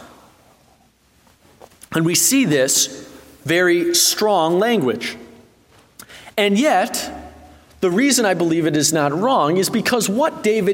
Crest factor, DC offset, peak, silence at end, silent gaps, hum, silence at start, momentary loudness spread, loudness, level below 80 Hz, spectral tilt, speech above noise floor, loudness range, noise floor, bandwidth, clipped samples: 16 dB; under 0.1%; -2 dBFS; 0 s; none; none; 0 s; 12 LU; -17 LUFS; -56 dBFS; -3 dB/octave; 39 dB; 4 LU; -56 dBFS; 16.5 kHz; under 0.1%